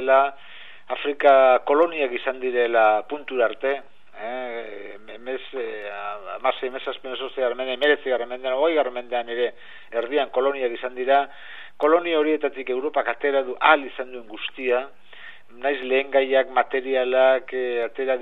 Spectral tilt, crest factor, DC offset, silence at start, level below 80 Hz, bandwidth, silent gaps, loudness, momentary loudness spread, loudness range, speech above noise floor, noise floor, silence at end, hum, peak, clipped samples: -5 dB/octave; 22 dB; 0.9%; 0 s; -74 dBFS; 4.4 kHz; none; -23 LUFS; 15 LU; 9 LU; 23 dB; -45 dBFS; 0 s; none; 0 dBFS; under 0.1%